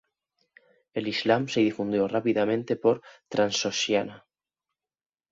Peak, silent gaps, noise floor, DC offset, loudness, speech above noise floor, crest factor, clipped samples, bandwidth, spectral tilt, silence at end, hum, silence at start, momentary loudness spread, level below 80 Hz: -6 dBFS; none; -88 dBFS; under 0.1%; -26 LUFS; 62 dB; 22 dB; under 0.1%; 7.8 kHz; -4.5 dB/octave; 1.15 s; none; 0.95 s; 8 LU; -68 dBFS